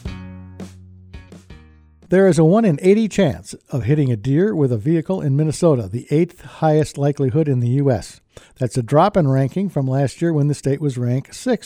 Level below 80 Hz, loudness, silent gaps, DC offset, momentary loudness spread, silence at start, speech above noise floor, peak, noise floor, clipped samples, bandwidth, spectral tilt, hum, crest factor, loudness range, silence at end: -46 dBFS; -18 LUFS; none; under 0.1%; 12 LU; 0.05 s; 30 dB; -4 dBFS; -47 dBFS; under 0.1%; 11.5 kHz; -7.5 dB/octave; none; 16 dB; 2 LU; 0 s